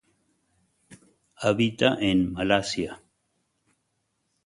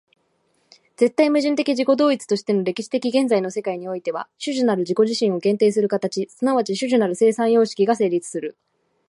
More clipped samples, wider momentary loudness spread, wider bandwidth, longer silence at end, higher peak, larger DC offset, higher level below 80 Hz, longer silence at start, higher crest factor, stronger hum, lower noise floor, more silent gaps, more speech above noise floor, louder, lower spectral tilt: neither; about the same, 10 LU vs 9 LU; about the same, 11.5 kHz vs 11.5 kHz; first, 1.5 s vs 0.6 s; about the same, -6 dBFS vs -4 dBFS; neither; first, -54 dBFS vs -74 dBFS; about the same, 0.9 s vs 1 s; first, 24 dB vs 16 dB; neither; first, -76 dBFS vs -66 dBFS; neither; first, 52 dB vs 46 dB; second, -25 LUFS vs -20 LUFS; about the same, -5 dB/octave vs -5 dB/octave